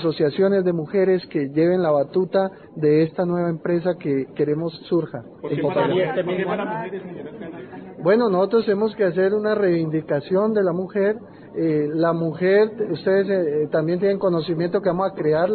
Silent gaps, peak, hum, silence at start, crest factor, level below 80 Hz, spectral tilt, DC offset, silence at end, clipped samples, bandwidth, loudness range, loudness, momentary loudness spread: none; -6 dBFS; none; 0 s; 14 dB; -62 dBFS; -12 dB/octave; under 0.1%; 0 s; under 0.1%; 4.5 kHz; 3 LU; -21 LUFS; 9 LU